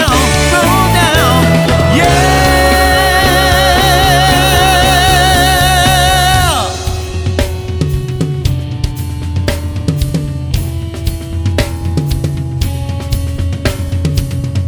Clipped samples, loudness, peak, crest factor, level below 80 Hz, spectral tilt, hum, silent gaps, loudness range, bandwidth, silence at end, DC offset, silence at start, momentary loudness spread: under 0.1%; -11 LUFS; 0 dBFS; 10 dB; -20 dBFS; -4 dB/octave; none; none; 9 LU; over 20 kHz; 0 s; under 0.1%; 0 s; 10 LU